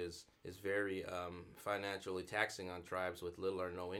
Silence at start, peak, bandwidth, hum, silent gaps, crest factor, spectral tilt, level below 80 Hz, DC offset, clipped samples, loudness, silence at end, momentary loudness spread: 0 s; -18 dBFS; 18 kHz; none; none; 24 dB; -4.5 dB/octave; -72 dBFS; under 0.1%; under 0.1%; -42 LUFS; 0 s; 9 LU